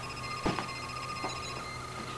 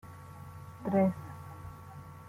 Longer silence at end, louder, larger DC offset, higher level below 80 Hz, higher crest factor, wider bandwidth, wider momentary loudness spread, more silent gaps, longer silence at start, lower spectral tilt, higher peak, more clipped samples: about the same, 0 s vs 0 s; second, -36 LUFS vs -32 LUFS; neither; first, -52 dBFS vs -64 dBFS; about the same, 20 dB vs 18 dB; second, 11 kHz vs 15 kHz; second, 6 LU vs 20 LU; neither; about the same, 0 s vs 0.05 s; second, -4 dB/octave vs -9 dB/octave; about the same, -18 dBFS vs -16 dBFS; neither